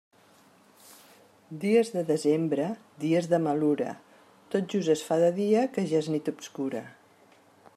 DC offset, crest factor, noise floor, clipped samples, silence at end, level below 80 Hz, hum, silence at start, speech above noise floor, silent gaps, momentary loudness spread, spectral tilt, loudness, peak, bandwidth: under 0.1%; 16 dB; -59 dBFS; under 0.1%; 0.85 s; -78 dBFS; none; 1.5 s; 33 dB; none; 10 LU; -6.5 dB/octave; -27 LUFS; -12 dBFS; 14.5 kHz